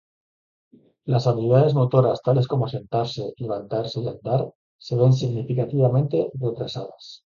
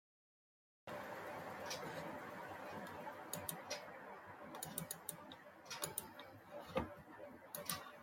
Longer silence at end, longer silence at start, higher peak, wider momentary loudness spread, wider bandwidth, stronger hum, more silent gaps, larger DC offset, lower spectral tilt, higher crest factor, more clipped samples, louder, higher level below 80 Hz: about the same, 0.1 s vs 0 s; first, 1.05 s vs 0.85 s; first, -2 dBFS vs -22 dBFS; about the same, 12 LU vs 10 LU; second, 7.2 kHz vs 16.5 kHz; neither; first, 4.55-4.79 s vs none; neither; first, -8.5 dB/octave vs -3 dB/octave; second, 20 dB vs 28 dB; neither; first, -22 LUFS vs -49 LUFS; first, -58 dBFS vs -74 dBFS